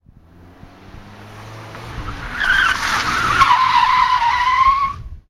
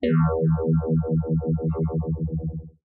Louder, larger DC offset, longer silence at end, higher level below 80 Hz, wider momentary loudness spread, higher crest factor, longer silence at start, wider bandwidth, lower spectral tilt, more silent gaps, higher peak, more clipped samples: first, -15 LUFS vs -24 LUFS; neither; about the same, 0.1 s vs 0.2 s; about the same, -38 dBFS vs -40 dBFS; first, 21 LU vs 7 LU; first, 18 dB vs 12 dB; first, 0.65 s vs 0 s; first, 15.5 kHz vs 4 kHz; second, -2 dB/octave vs -13.5 dB/octave; neither; first, 0 dBFS vs -12 dBFS; neither